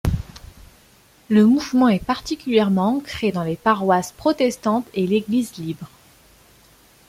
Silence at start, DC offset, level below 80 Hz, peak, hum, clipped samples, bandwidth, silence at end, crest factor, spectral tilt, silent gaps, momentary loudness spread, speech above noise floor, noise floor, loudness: 0.05 s; under 0.1%; -40 dBFS; -4 dBFS; none; under 0.1%; 15.5 kHz; 1.2 s; 16 dB; -6 dB/octave; none; 13 LU; 34 dB; -53 dBFS; -20 LUFS